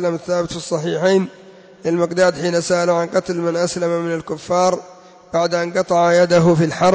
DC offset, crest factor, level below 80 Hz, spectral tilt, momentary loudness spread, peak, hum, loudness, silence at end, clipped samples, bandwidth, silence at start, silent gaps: under 0.1%; 12 dB; -54 dBFS; -5.5 dB/octave; 9 LU; -4 dBFS; none; -18 LUFS; 0 s; under 0.1%; 8 kHz; 0 s; none